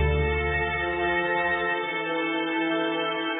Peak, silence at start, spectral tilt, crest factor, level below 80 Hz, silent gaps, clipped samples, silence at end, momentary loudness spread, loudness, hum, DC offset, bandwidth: -14 dBFS; 0 s; -9.5 dB/octave; 12 dB; -36 dBFS; none; under 0.1%; 0 s; 3 LU; -25 LUFS; none; under 0.1%; 4 kHz